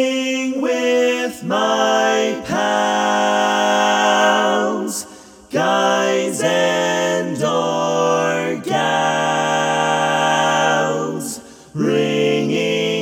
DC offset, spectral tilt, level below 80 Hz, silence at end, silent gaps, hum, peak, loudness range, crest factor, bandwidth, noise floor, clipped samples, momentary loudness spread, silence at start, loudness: under 0.1%; -3.5 dB/octave; -62 dBFS; 0 s; none; none; -2 dBFS; 2 LU; 14 dB; 18 kHz; -40 dBFS; under 0.1%; 6 LU; 0 s; -17 LUFS